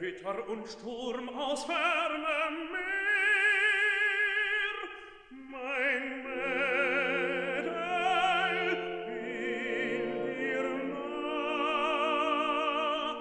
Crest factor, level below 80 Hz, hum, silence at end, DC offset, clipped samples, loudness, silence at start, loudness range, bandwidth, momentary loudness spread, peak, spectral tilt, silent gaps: 16 dB; -68 dBFS; none; 0 s; under 0.1%; under 0.1%; -30 LUFS; 0 s; 5 LU; 10.5 kHz; 12 LU; -16 dBFS; -3.5 dB/octave; none